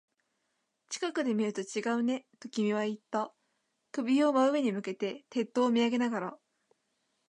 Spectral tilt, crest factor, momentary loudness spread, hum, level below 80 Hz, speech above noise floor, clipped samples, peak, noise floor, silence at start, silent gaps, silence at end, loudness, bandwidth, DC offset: -5 dB/octave; 16 dB; 11 LU; none; -86 dBFS; 50 dB; under 0.1%; -16 dBFS; -80 dBFS; 0.9 s; none; 0.95 s; -31 LUFS; 10.5 kHz; under 0.1%